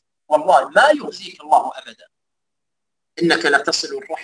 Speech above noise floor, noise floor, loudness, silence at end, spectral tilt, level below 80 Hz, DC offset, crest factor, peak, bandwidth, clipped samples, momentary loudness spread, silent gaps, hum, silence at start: 66 dB; -84 dBFS; -17 LUFS; 0 s; -3 dB/octave; -70 dBFS; under 0.1%; 18 dB; 0 dBFS; 10.5 kHz; under 0.1%; 17 LU; none; none; 0.3 s